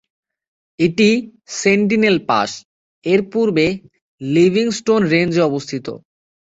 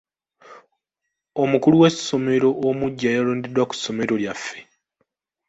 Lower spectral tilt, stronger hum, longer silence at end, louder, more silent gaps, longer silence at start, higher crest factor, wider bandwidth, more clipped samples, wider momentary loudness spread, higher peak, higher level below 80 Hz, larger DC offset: about the same, -5.5 dB/octave vs -5.5 dB/octave; neither; second, 0.6 s vs 0.85 s; first, -16 LUFS vs -20 LUFS; first, 2.65-3.02 s, 4.02-4.18 s vs none; first, 0.8 s vs 0.5 s; about the same, 16 dB vs 20 dB; about the same, 8 kHz vs 8.2 kHz; neither; about the same, 14 LU vs 14 LU; about the same, 0 dBFS vs -2 dBFS; first, -54 dBFS vs -60 dBFS; neither